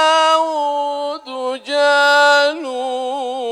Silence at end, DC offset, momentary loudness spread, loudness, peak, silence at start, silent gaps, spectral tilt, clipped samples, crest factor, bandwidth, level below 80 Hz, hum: 0 s; under 0.1%; 13 LU; -16 LUFS; -2 dBFS; 0 s; none; 0.5 dB/octave; under 0.1%; 14 dB; 15 kHz; -74 dBFS; none